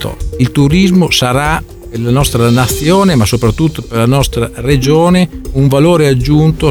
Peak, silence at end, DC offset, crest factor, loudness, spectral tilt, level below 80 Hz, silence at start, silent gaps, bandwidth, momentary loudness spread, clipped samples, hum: 0 dBFS; 0 s; under 0.1%; 10 dB; -10 LUFS; -6 dB/octave; -24 dBFS; 0 s; none; 19 kHz; 7 LU; under 0.1%; none